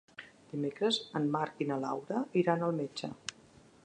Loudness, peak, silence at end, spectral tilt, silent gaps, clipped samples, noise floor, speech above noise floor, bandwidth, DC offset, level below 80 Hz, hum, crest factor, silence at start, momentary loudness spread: -34 LUFS; -14 dBFS; 0.55 s; -5.5 dB/octave; none; under 0.1%; -60 dBFS; 27 dB; 10 kHz; under 0.1%; -76 dBFS; none; 20 dB; 0.2 s; 13 LU